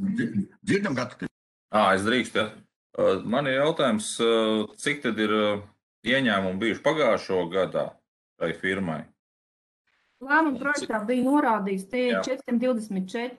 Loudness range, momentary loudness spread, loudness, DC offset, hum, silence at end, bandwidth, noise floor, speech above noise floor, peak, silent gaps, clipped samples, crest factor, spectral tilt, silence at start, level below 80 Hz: 4 LU; 10 LU; -25 LUFS; under 0.1%; none; 0 s; 12.5 kHz; under -90 dBFS; over 65 dB; -10 dBFS; 1.31-1.69 s, 2.76-2.90 s, 5.83-6.03 s, 8.08-8.36 s, 9.19-9.85 s; under 0.1%; 16 dB; -5 dB/octave; 0 s; -68 dBFS